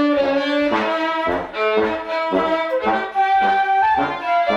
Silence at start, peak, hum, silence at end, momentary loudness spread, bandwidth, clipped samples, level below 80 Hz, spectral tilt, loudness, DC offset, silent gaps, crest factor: 0 s; -6 dBFS; none; 0 s; 5 LU; 9 kHz; under 0.1%; -50 dBFS; -5.5 dB/octave; -19 LUFS; under 0.1%; none; 12 dB